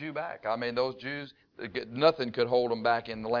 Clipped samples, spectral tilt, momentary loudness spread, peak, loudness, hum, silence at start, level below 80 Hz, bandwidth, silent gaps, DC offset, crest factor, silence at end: under 0.1%; -6.5 dB/octave; 12 LU; -10 dBFS; -30 LUFS; none; 0 s; -66 dBFS; 5.4 kHz; none; under 0.1%; 20 dB; 0 s